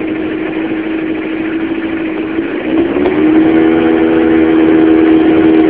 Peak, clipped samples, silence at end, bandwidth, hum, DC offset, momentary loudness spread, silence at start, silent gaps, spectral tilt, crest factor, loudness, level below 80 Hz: 0 dBFS; 0.4%; 0 s; 4 kHz; none; 0.5%; 9 LU; 0 s; none; -10.5 dB/octave; 10 dB; -11 LUFS; -38 dBFS